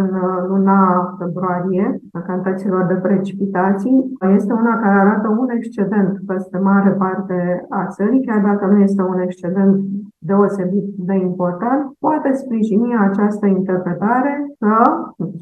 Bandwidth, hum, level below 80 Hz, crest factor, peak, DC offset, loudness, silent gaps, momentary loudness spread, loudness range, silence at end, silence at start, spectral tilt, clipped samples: 3.7 kHz; none; -64 dBFS; 16 dB; 0 dBFS; under 0.1%; -17 LUFS; none; 7 LU; 2 LU; 0 s; 0 s; -10.5 dB/octave; under 0.1%